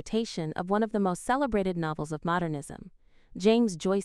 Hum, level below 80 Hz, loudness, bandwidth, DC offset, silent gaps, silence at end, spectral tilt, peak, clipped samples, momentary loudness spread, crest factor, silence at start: none; -52 dBFS; -29 LUFS; 13.5 kHz; under 0.1%; none; 0 s; -6 dB/octave; -10 dBFS; under 0.1%; 11 LU; 18 dB; 0 s